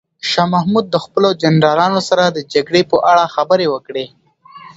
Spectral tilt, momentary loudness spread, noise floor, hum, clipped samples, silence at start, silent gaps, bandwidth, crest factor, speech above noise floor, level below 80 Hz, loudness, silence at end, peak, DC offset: -5.5 dB/octave; 7 LU; -39 dBFS; none; under 0.1%; 0.25 s; none; 8 kHz; 14 dB; 26 dB; -56 dBFS; -14 LUFS; 0.1 s; 0 dBFS; under 0.1%